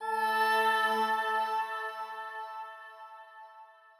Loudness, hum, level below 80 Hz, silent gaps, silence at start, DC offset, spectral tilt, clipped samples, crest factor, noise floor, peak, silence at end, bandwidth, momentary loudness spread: -30 LUFS; none; under -90 dBFS; none; 0 s; under 0.1%; -1.5 dB/octave; under 0.1%; 16 dB; -55 dBFS; -16 dBFS; 0.3 s; 16 kHz; 23 LU